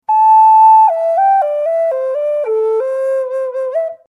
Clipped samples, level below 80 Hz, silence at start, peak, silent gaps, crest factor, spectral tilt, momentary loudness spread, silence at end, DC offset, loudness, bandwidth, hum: under 0.1%; -82 dBFS; 0.1 s; -2 dBFS; none; 10 dB; -2 dB/octave; 12 LU; 0.15 s; under 0.1%; -12 LUFS; 9.6 kHz; none